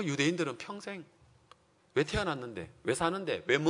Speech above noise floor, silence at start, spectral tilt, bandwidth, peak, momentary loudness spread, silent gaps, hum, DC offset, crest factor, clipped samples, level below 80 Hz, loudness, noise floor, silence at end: 31 dB; 0 s; -4.5 dB/octave; 11 kHz; -12 dBFS; 12 LU; none; none; under 0.1%; 22 dB; under 0.1%; -56 dBFS; -33 LUFS; -63 dBFS; 0 s